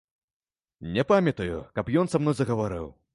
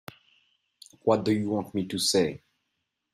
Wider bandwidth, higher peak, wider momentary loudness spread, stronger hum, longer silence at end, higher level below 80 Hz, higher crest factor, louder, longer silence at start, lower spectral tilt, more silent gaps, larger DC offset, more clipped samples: second, 11.5 kHz vs 15.5 kHz; about the same, -8 dBFS vs -10 dBFS; about the same, 10 LU vs 12 LU; neither; second, 0.25 s vs 0.75 s; first, -50 dBFS vs -66 dBFS; about the same, 20 dB vs 20 dB; about the same, -26 LUFS vs -27 LUFS; second, 0.8 s vs 1.05 s; first, -7 dB/octave vs -4.5 dB/octave; neither; neither; neither